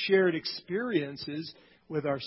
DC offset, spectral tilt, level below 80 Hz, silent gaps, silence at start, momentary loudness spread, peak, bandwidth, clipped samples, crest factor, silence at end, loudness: under 0.1%; -9 dB/octave; -70 dBFS; none; 0 s; 13 LU; -14 dBFS; 5.8 kHz; under 0.1%; 18 dB; 0 s; -31 LUFS